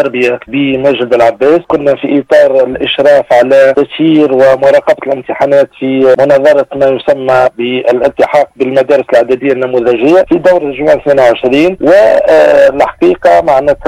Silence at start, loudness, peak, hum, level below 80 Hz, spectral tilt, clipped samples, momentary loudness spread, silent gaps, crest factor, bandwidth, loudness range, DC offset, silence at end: 0 s; -8 LUFS; 0 dBFS; none; -42 dBFS; -6 dB/octave; under 0.1%; 5 LU; none; 8 dB; 10.5 kHz; 2 LU; under 0.1%; 0 s